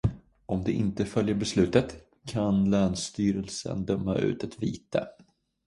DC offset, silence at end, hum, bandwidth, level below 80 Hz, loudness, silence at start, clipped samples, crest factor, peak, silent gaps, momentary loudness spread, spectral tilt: under 0.1%; 0.55 s; none; 11.5 kHz; -48 dBFS; -28 LUFS; 0.05 s; under 0.1%; 20 dB; -8 dBFS; none; 10 LU; -6 dB/octave